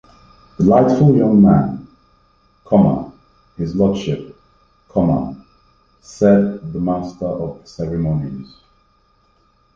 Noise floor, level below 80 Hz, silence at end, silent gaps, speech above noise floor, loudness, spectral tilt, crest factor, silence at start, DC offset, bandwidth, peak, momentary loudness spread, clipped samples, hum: -58 dBFS; -42 dBFS; 1.3 s; none; 43 dB; -16 LUFS; -9 dB/octave; 16 dB; 0.6 s; under 0.1%; 7.2 kHz; -2 dBFS; 16 LU; under 0.1%; none